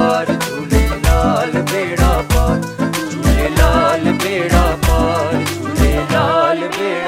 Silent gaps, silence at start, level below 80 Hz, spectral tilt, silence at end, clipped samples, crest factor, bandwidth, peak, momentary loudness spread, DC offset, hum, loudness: none; 0 s; -20 dBFS; -5.5 dB/octave; 0 s; under 0.1%; 14 dB; 16.5 kHz; 0 dBFS; 5 LU; under 0.1%; none; -15 LUFS